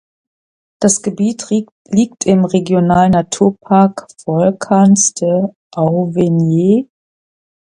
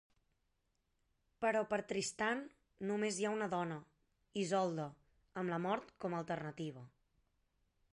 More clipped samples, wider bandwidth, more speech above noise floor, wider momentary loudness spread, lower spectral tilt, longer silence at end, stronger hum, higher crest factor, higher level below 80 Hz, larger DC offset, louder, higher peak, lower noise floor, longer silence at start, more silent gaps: neither; about the same, 11.5 kHz vs 11 kHz; first, over 78 dB vs 43 dB; second, 8 LU vs 11 LU; first, -6 dB/octave vs -4.5 dB/octave; second, 0.8 s vs 1.05 s; neither; about the same, 14 dB vs 18 dB; first, -48 dBFS vs -78 dBFS; neither; first, -13 LUFS vs -40 LUFS; first, 0 dBFS vs -24 dBFS; first, under -90 dBFS vs -82 dBFS; second, 0.8 s vs 1.4 s; first, 1.72-1.85 s, 5.56-5.71 s vs none